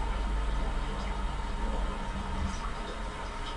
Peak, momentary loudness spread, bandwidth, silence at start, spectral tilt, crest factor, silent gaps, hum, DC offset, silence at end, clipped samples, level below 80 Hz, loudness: -20 dBFS; 4 LU; 11 kHz; 0 s; -5.5 dB/octave; 12 dB; none; none; under 0.1%; 0 s; under 0.1%; -34 dBFS; -36 LUFS